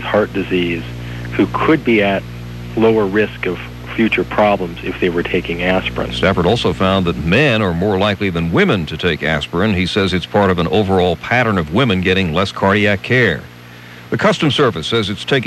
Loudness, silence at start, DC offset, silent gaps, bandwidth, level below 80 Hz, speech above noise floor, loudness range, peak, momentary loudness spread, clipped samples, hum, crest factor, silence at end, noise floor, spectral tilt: -15 LUFS; 0 s; under 0.1%; none; 12.5 kHz; -36 dBFS; 21 dB; 2 LU; 0 dBFS; 9 LU; under 0.1%; 60 Hz at -35 dBFS; 14 dB; 0 s; -36 dBFS; -6.5 dB/octave